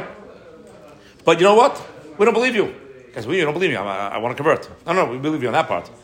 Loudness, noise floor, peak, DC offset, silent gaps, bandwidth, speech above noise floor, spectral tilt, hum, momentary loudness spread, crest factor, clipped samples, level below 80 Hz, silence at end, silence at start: -19 LUFS; -44 dBFS; 0 dBFS; under 0.1%; none; 16 kHz; 26 dB; -5 dB/octave; none; 14 LU; 20 dB; under 0.1%; -60 dBFS; 0.15 s; 0 s